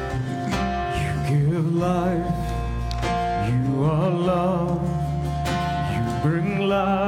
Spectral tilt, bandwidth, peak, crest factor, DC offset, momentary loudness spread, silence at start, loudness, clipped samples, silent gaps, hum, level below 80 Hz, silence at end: -7.5 dB/octave; 15 kHz; -10 dBFS; 12 dB; under 0.1%; 5 LU; 0 s; -23 LUFS; under 0.1%; none; none; -34 dBFS; 0 s